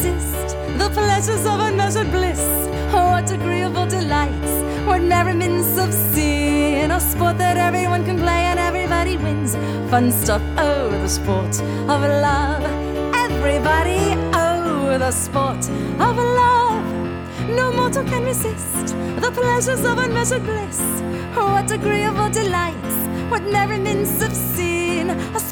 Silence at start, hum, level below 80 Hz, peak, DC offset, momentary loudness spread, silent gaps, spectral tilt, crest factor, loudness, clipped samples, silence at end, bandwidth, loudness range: 0 s; none; -30 dBFS; -2 dBFS; under 0.1%; 5 LU; none; -4.5 dB/octave; 16 dB; -19 LUFS; under 0.1%; 0 s; over 20 kHz; 2 LU